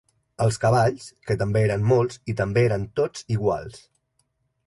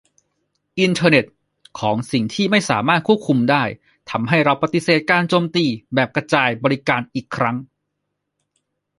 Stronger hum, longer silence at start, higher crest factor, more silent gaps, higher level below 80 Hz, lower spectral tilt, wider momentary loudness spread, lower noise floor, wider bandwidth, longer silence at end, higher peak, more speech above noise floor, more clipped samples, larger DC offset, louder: second, none vs 50 Hz at -50 dBFS; second, 0.4 s vs 0.75 s; about the same, 16 dB vs 18 dB; neither; first, -48 dBFS vs -58 dBFS; about the same, -6.5 dB/octave vs -5.5 dB/octave; about the same, 8 LU vs 10 LU; second, -71 dBFS vs -76 dBFS; about the same, 11.5 kHz vs 11.5 kHz; second, 0.9 s vs 1.35 s; second, -8 dBFS vs -2 dBFS; second, 49 dB vs 59 dB; neither; neither; second, -23 LUFS vs -18 LUFS